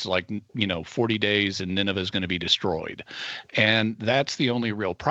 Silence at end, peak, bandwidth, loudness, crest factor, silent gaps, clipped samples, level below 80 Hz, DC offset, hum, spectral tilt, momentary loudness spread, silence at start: 0 s; -6 dBFS; 8.2 kHz; -25 LUFS; 20 dB; none; under 0.1%; -58 dBFS; under 0.1%; none; -4.5 dB/octave; 11 LU; 0 s